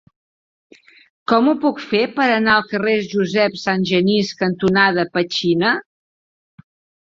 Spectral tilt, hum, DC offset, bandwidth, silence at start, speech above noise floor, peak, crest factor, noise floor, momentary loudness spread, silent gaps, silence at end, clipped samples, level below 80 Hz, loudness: -5.5 dB/octave; none; under 0.1%; 7.6 kHz; 1.3 s; over 73 dB; -2 dBFS; 18 dB; under -90 dBFS; 5 LU; none; 1.2 s; under 0.1%; -58 dBFS; -17 LUFS